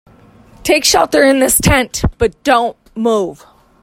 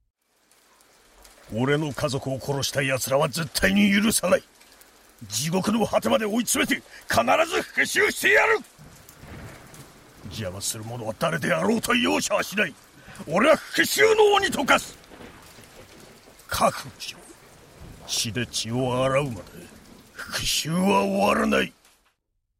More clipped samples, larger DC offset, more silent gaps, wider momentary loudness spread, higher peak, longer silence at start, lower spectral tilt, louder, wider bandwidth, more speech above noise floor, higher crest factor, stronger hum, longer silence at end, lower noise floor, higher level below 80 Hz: neither; neither; neither; second, 9 LU vs 16 LU; first, 0 dBFS vs -6 dBFS; second, 0.65 s vs 1.5 s; about the same, -3.5 dB/octave vs -3.5 dB/octave; first, -13 LUFS vs -23 LUFS; about the same, 16.5 kHz vs 16 kHz; second, 31 dB vs 51 dB; second, 14 dB vs 20 dB; neither; second, 0.5 s vs 0.9 s; second, -43 dBFS vs -74 dBFS; first, -30 dBFS vs -52 dBFS